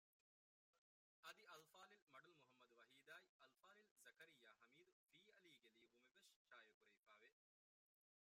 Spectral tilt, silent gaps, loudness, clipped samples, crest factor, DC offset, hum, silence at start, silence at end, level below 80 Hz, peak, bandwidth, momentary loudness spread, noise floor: -1.5 dB/octave; 0.78-1.23 s, 2.02-2.07 s, 3.29-3.39 s, 3.91-3.96 s, 4.92-5.09 s, 6.36-6.45 s, 6.74-6.81 s, 6.97-7.03 s; -67 LUFS; under 0.1%; 26 dB; under 0.1%; none; 0.75 s; 0.95 s; under -90 dBFS; -48 dBFS; 15.5 kHz; 5 LU; under -90 dBFS